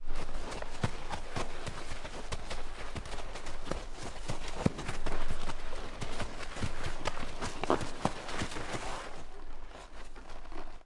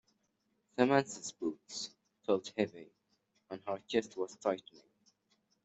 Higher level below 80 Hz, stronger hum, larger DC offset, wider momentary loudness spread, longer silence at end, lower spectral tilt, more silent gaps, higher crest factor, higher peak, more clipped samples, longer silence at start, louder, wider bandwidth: first, -38 dBFS vs -82 dBFS; neither; neither; about the same, 14 LU vs 16 LU; second, 0.05 s vs 1.05 s; about the same, -4.5 dB/octave vs -4.5 dB/octave; neither; about the same, 22 dB vs 26 dB; about the same, -10 dBFS vs -12 dBFS; neither; second, 0 s vs 0.8 s; second, -40 LUFS vs -36 LUFS; first, 11 kHz vs 8.2 kHz